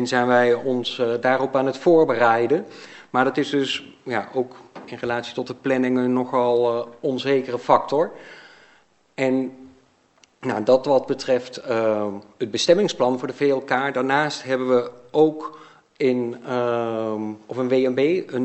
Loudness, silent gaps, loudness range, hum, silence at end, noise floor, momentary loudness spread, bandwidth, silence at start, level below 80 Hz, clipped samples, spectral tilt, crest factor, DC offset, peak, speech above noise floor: -22 LUFS; none; 4 LU; none; 0 s; -58 dBFS; 11 LU; 8.4 kHz; 0 s; -70 dBFS; under 0.1%; -5 dB/octave; 22 dB; under 0.1%; 0 dBFS; 37 dB